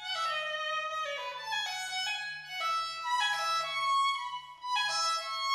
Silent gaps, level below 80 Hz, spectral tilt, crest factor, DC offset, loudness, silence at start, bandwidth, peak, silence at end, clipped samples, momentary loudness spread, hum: none; -78 dBFS; 2 dB/octave; 14 dB; under 0.1%; -32 LUFS; 0 s; 19.5 kHz; -18 dBFS; 0 s; under 0.1%; 7 LU; none